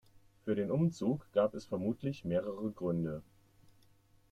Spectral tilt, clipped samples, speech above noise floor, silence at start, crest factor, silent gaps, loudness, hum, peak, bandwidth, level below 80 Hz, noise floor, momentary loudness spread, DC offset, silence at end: -8.5 dB/octave; under 0.1%; 32 dB; 0.15 s; 18 dB; none; -36 LUFS; none; -18 dBFS; 9.6 kHz; -66 dBFS; -66 dBFS; 8 LU; under 0.1%; 1.1 s